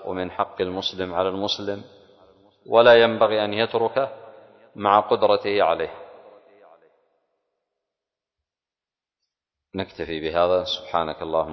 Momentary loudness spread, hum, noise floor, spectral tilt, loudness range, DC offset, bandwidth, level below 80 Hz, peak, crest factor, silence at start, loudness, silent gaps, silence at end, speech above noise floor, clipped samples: 15 LU; none; under -90 dBFS; -5 dB/octave; 13 LU; under 0.1%; 6.4 kHz; -56 dBFS; -2 dBFS; 20 dB; 0 s; -22 LUFS; none; 0 s; over 69 dB; under 0.1%